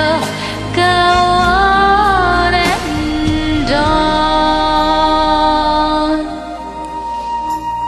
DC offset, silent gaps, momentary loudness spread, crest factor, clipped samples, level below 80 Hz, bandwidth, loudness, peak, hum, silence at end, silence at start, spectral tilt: under 0.1%; none; 11 LU; 12 dB; under 0.1%; -26 dBFS; 13.5 kHz; -13 LUFS; 0 dBFS; none; 0 s; 0 s; -5 dB/octave